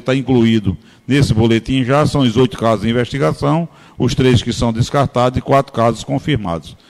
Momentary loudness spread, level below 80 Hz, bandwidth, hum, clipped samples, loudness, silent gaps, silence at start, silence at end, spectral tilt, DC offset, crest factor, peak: 6 LU; -36 dBFS; 13 kHz; none; under 0.1%; -15 LUFS; none; 0.05 s; 0.15 s; -6.5 dB/octave; under 0.1%; 12 dB; -2 dBFS